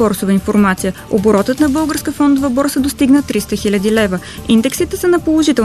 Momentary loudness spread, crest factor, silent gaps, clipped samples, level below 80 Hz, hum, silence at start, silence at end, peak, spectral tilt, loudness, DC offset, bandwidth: 5 LU; 12 dB; none; under 0.1%; -36 dBFS; none; 0 s; 0 s; -2 dBFS; -5 dB/octave; -14 LUFS; 0.2%; 14 kHz